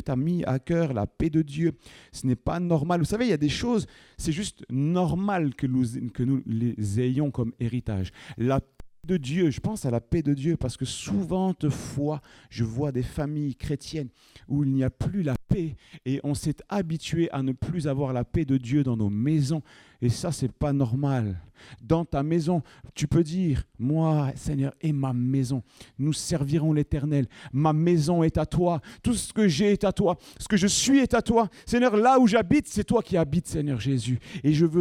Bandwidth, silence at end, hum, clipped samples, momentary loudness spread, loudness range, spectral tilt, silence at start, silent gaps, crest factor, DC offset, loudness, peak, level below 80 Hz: 14.5 kHz; 0 s; none; under 0.1%; 8 LU; 6 LU; -6.5 dB/octave; 0 s; none; 18 dB; under 0.1%; -26 LUFS; -8 dBFS; -46 dBFS